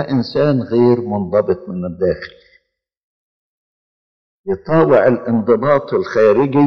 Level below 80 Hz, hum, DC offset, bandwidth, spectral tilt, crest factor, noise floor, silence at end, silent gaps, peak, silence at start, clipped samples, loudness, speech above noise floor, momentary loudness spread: -50 dBFS; none; under 0.1%; 6.6 kHz; -9 dB/octave; 14 dB; -60 dBFS; 0 s; 2.97-4.44 s; -2 dBFS; 0 s; under 0.1%; -15 LUFS; 46 dB; 12 LU